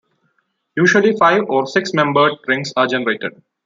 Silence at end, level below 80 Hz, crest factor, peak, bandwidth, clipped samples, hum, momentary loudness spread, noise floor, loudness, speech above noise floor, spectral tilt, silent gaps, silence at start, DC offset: 0.35 s; -64 dBFS; 16 dB; -2 dBFS; 7.6 kHz; under 0.1%; none; 9 LU; -67 dBFS; -15 LUFS; 51 dB; -5 dB/octave; none; 0.75 s; under 0.1%